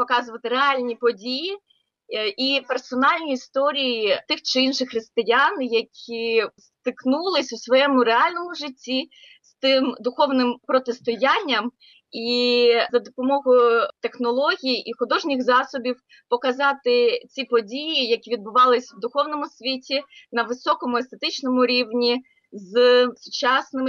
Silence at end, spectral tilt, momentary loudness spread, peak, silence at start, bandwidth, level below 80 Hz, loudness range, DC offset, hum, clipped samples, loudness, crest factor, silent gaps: 0 s; -3 dB/octave; 10 LU; -8 dBFS; 0 s; 7.2 kHz; -76 dBFS; 3 LU; under 0.1%; none; under 0.1%; -21 LUFS; 14 dB; none